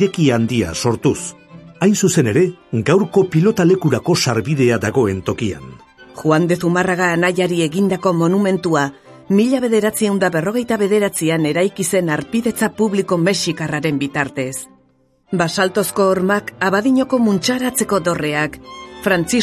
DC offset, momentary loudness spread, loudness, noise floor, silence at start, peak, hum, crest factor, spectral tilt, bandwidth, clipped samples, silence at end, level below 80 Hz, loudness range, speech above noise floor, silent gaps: under 0.1%; 7 LU; -17 LUFS; -57 dBFS; 0 s; 0 dBFS; none; 16 dB; -5 dB/octave; 14.5 kHz; under 0.1%; 0 s; -48 dBFS; 3 LU; 41 dB; none